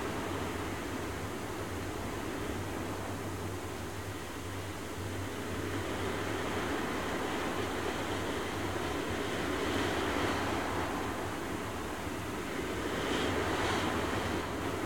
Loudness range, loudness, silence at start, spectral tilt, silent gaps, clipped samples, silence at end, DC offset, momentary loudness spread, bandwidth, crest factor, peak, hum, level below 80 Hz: 5 LU; -35 LUFS; 0 s; -4.5 dB/octave; none; under 0.1%; 0 s; 0.3%; 7 LU; 17.5 kHz; 16 dB; -20 dBFS; none; -52 dBFS